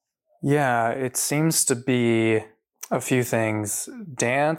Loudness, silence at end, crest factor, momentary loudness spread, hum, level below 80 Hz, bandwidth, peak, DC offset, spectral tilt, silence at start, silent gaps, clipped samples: -23 LUFS; 0 s; 16 dB; 8 LU; none; -68 dBFS; 17 kHz; -8 dBFS; under 0.1%; -4.5 dB/octave; 0.4 s; none; under 0.1%